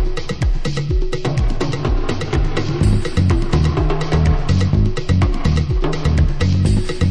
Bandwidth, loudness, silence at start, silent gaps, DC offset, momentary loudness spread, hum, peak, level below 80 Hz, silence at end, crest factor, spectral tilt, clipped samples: 10.5 kHz; -18 LUFS; 0 s; none; under 0.1%; 4 LU; none; -4 dBFS; -20 dBFS; 0 s; 12 dB; -7 dB/octave; under 0.1%